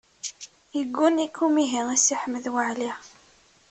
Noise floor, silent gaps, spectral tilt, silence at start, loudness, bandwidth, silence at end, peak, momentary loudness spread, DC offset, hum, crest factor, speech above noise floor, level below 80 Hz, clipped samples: -58 dBFS; none; -1.5 dB/octave; 0.25 s; -24 LUFS; 8.8 kHz; 0.65 s; -8 dBFS; 15 LU; under 0.1%; none; 18 dB; 34 dB; -70 dBFS; under 0.1%